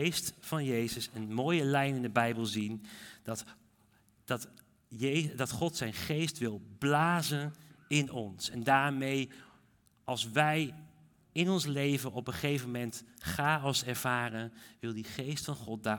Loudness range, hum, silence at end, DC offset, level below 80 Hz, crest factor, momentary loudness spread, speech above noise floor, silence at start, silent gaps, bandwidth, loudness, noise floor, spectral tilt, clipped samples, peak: 5 LU; none; 0 s; under 0.1%; -68 dBFS; 22 dB; 13 LU; 34 dB; 0 s; none; 18 kHz; -33 LUFS; -68 dBFS; -4.5 dB/octave; under 0.1%; -12 dBFS